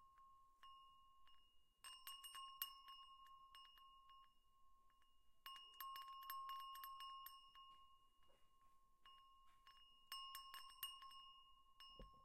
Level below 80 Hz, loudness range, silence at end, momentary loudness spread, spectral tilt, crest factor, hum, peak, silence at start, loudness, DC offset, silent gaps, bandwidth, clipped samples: -80 dBFS; 5 LU; 0 s; 16 LU; 0.5 dB/octave; 28 dB; none; -32 dBFS; 0 s; -57 LUFS; under 0.1%; none; 15.5 kHz; under 0.1%